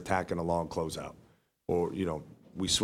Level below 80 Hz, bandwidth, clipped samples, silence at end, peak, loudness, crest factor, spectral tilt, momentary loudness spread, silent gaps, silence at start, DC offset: -54 dBFS; 16 kHz; under 0.1%; 0 s; -14 dBFS; -33 LUFS; 20 dB; -4 dB/octave; 14 LU; none; 0 s; under 0.1%